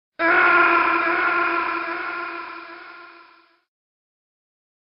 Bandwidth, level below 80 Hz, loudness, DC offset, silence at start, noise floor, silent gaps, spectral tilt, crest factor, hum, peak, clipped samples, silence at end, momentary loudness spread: 5.6 kHz; -62 dBFS; -19 LUFS; under 0.1%; 0.2 s; -53 dBFS; none; -7 dB/octave; 20 dB; none; -2 dBFS; under 0.1%; 1.9 s; 21 LU